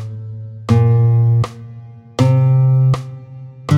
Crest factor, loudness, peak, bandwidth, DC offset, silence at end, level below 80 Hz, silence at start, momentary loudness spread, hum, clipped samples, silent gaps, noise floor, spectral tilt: 14 dB; -14 LUFS; 0 dBFS; 8.2 kHz; under 0.1%; 0 s; -48 dBFS; 0 s; 21 LU; none; under 0.1%; none; -35 dBFS; -8.5 dB/octave